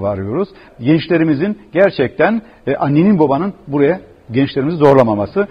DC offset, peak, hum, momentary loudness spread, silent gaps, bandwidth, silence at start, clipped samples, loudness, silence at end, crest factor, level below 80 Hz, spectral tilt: under 0.1%; 0 dBFS; none; 10 LU; none; 6.4 kHz; 0 s; under 0.1%; -15 LUFS; 0.05 s; 14 dB; -48 dBFS; -9 dB/octave